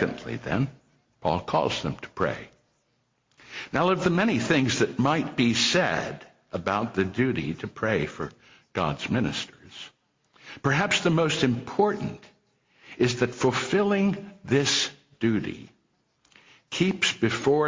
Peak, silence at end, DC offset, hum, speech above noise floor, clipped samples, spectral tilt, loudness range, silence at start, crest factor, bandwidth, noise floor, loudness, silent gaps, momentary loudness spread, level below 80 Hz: -10 dBFS; 0 s; under 0.1%; none; 46 dB; under 0.1%; -4.5 dB/octave; 5 LU; 0 s; 18 dB; 7.6 kHz; -71 dBFS; -26 LUFS; none; 15 LU; -54 dBFS